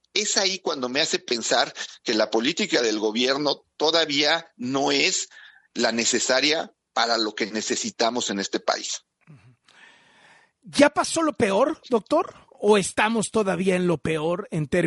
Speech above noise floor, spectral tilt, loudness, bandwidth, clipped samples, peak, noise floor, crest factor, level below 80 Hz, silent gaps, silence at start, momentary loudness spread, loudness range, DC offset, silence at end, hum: 33 dB; -3 dB/octave; -23 LUFS; 11.5 kHz; under 0.1%; -4 dBFS; -56 dBFS; 20 dB; -62 dBFS; none; 0.15 s; 7 LU; 4 LU; under 0.1%; 0 s; none